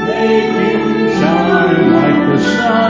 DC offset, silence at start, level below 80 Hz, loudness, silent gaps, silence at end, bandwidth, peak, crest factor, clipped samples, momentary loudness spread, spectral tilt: under 0.1%; 0 s; -44 dBFS; -12 LUFS; none; 0 s; 7.8 kHz; 0 dBFS; 10 dB; under 0.1%; 3 LU; -6.5 dB/octave